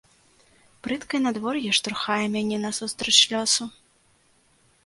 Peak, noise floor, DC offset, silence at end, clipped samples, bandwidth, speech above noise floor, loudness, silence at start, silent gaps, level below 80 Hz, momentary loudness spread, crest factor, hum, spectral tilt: -2 dBFS; -62 dBFS; under 0.1%; 1.15 s; under 0.1%; 11.5 kHz; 38 dB; -23 LUFS; 0.85 s; none; -64 dBFS; 14 LU; 24 dB; none; -1.5 dB/octave